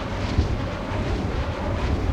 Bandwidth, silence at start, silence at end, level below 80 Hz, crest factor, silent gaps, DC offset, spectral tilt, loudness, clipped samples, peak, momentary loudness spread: 9.8 kHz; 0 s; 0 s; -30 dBFS; 16 dB; none; under 0.1%; -7 dB/octave; -26 LUFS; under 0.1%; -8 dBFS; 3 LU